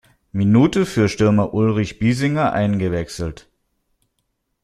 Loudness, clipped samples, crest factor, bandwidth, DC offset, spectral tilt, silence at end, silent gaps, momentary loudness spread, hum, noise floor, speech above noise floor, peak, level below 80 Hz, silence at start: -18 LUFS; under 0.1%; 18 dB; 12.5 kHz; under 0.1%; -7 dB/octave; 1.3 s; none; 12 LU; none; -72 dBFS; 55 dB; -2 dBFS; -44 dBFS; 0.35 s